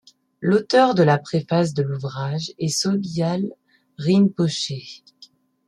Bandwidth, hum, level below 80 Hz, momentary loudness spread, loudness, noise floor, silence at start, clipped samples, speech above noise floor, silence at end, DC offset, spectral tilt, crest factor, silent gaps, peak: 13 kHz; none; -64 dBFS; 11 LU; -21 LUFS; -52 dBFS; 0.4 s; under 0.1%; 32 dB; 0.4 s; under 0.1%; -5.5 dB/octave; 18 dB; none; -4 dBFS